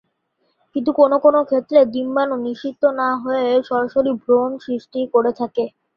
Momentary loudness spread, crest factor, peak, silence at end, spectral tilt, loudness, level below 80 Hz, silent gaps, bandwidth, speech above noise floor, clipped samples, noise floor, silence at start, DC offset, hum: 9 LU; 16 dB; -2 dBFS; 0.3 s; -7 dB/octave; -18 LUFS; -64 dBFS; none; 6 kHz; 51 dB; under 0.1%; -68 dBFS; 0.75 s; under 0.1%; none